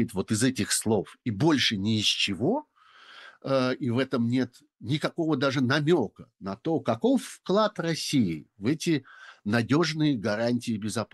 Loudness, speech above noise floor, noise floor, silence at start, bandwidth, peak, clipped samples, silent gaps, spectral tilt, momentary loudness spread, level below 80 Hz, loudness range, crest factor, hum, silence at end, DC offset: -26 LUFS; 27 dB; -54 dBFS; 0 s; 12.5 kHz; -10 dBFS; under 0.1%; none; -5 dB/octave; 8 LU; -66 dBFS; 2 LU; 18 dB; none; 0.1 s; under 0.1%